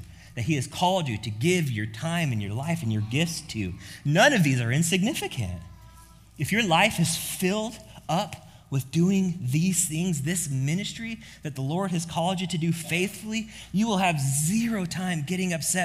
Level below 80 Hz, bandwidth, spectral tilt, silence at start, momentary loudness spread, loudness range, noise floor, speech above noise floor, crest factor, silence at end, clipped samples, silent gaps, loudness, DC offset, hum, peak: -54 dBFS; 16 kHz; -4.5 dB/octave; 0 s; 11 LU; 3 LU; -50 dBFS; 25 dB; 20 dB; 0 s; under 0.1%; none; -26 LUFS; under 0.1%; none; -6 dBFS